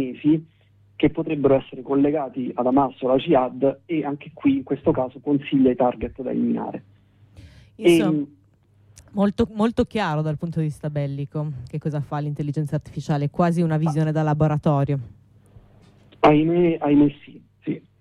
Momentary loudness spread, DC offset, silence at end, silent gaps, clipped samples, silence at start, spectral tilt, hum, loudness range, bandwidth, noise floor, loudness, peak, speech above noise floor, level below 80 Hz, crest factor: 11 LU; under 0.1%; 0.2 s; none; under 0.1%; 0 s; -8 dB/octave; none; 4 LU; 12.5 kHz; -57 dBFS; -22 LUFS; -6 dBFS; 36 dB; -50 dBFS; 16 dB